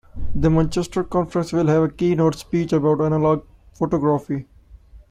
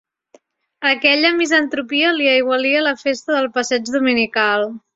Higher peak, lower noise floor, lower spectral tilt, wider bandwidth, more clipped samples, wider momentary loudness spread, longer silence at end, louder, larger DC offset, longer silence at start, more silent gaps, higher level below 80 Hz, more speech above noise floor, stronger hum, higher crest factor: second, -6 dBFS vs 0 dBFS; second, -45 dBFS vs -54 dBFS; first, -8 dB/octave vs -2 dB/octave; first, 11.5 kHz vs 8 kHz; neither; about the same, 6 LU vs 6 LU; about the same, 0.15 s vs 0.15 s; second, -20 LUFS vs -16 LUFS; neither; second, 0.15 s vs 0.8 s; neither; first, -38 dBFS vs -64 dBFS; second, 26 dB vs 37 dB; neither; about the same, 14 dB vs 18 dB